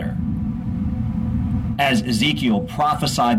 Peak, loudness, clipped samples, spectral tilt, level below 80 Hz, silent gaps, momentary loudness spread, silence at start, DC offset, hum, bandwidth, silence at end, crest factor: -8 dBFS; -21 LUFS; under 0.1%; -5.5 dB/octave; -34 dBFS; none; 7 LU; 0 s; under 0.1%; none; 16 kHz; 0 s; 12 dB